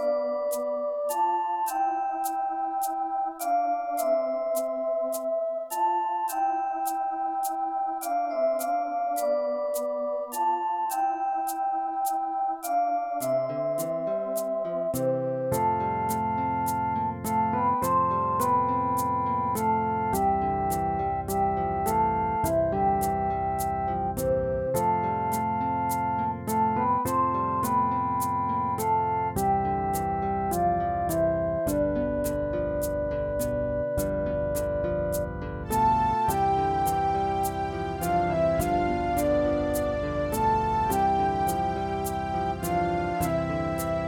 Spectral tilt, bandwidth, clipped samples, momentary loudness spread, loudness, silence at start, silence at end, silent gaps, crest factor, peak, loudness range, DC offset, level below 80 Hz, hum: -6 dB/octave; over 20 kHz; under 0.1%; 4 LU; -27 LUFS; 0 s; 0 s; none; 12 dB; -14 dBFS; 2 LU; under 0.1%; -44 dBFS; none